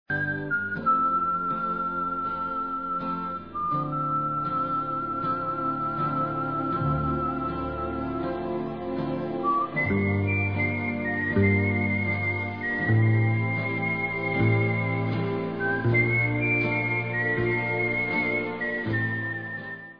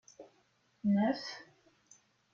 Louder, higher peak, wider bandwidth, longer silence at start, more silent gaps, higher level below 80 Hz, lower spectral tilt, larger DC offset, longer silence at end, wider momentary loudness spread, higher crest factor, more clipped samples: first, -26 LUFS vs -34 LUFS; first, -10 dBFS vs -20 dBFS; second, 5.2 kHz vs 7.2 kHz; about the same, 0.1 s vs 0.2 s; neither; first, -50 dBFS vs -76 dBFS; first, -10 dB/octave vs -6.5 dB/octave; first, 0.2% vs under 0.1%; second, 0 s vs 0.9 s; second, 7 LU vs 20 LU; about the same, 16 dB vs 18 dB; neither